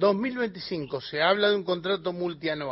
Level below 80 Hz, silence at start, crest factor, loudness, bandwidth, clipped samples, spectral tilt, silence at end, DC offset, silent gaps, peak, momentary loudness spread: -64 dBFS; 0 s; 18 dB; -27 LUFS; 5.8 kHz; under 0.1%; -9 dB/octave; 0 s; under 0.1%; none; -10 dBFS; 10 LU